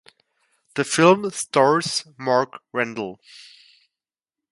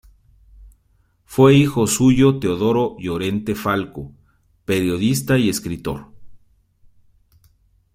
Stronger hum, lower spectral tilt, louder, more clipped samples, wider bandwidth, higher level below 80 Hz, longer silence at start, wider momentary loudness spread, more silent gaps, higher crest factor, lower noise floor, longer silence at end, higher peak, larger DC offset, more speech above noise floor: neither; second, -4 dB/octave vs -5.5 dB/octave; second, -21 LUFS vs -18 LUFS; neither; second, 11.5 kHz vs 16 kHz; second, -70 dBFS vs -46 dBFS; first, 0.75 s vs 0.6 s; about the same, 16 LU vs 17 LU; neither; about the same, 22 dB vs 18 dB; first, -89 dBFS vs -61 dBFS; second, 1.1 s vs 1.6 s; about the same, -2 dBFS vs -2 dBFS; neither; first, 68 dB vs 43 dB